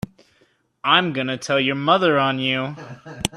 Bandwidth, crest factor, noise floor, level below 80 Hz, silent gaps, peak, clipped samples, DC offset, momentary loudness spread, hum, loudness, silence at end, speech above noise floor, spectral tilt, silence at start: 14.5 kHz; 20 dB; -62 dBFS; -54 dBFS; none; -2 dBFS; under 0.1%; under 0.1%; 17 LU; none; -19 LUFS; 0 s; 42 dB; -4 dB/octave; 0.85 s